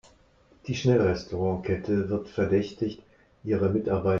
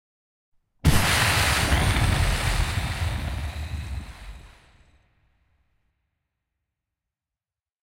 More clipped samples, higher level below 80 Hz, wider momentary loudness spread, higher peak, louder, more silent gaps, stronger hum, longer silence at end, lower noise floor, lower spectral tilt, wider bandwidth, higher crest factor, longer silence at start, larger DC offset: neither; second, -54 dBFS vs -32 dBFS; second, 10 LU vs 17 LU; second, -10 dBFS vs -6 dBFS; second, -27 LUFS vs -23 LUFS; neither; neither; second, 0 s vs 3.35 s; second, -60 dBFS vs under -90 dBFS; first, -7.5 dB/octave vs -3.5 dB/octave; second, 7.4 kHz vs 16 kHz; about the same, 16 dB vs 20 dB; second, 0.65 s vs 0.85 s; neither